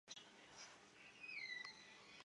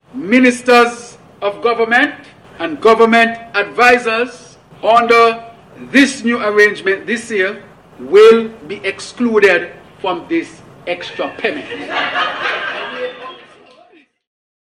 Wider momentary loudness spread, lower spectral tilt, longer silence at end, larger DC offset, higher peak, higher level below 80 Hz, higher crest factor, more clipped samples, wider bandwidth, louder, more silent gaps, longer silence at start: second, 13 LU vs 16 LU; second, -0.5 dB/octave vs -3.5 dB/octave; second, 0 s vs 1.3 s; neither; second, -36 dBFS vs 0 dBFS; second, under -90 dBFS vs -56 dBFS; first, 22 dB vs 14 dB; neither; second, 11 kHz vs 13 kHz; second, -54 LUFS vs -13 LUFS; neither; about the same, 0.05 s vs 0.15 s